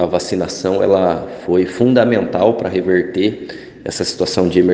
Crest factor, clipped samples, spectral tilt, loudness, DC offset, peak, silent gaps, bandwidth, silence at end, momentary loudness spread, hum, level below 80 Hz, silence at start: 16 dB; under 0.1%; -5.5 dB/octave; -16 LUFS; under 0.1%; 0 dBFS; none; 9.6 kHz; 0 s; 9 LU; none; -48 dBFS; 0 s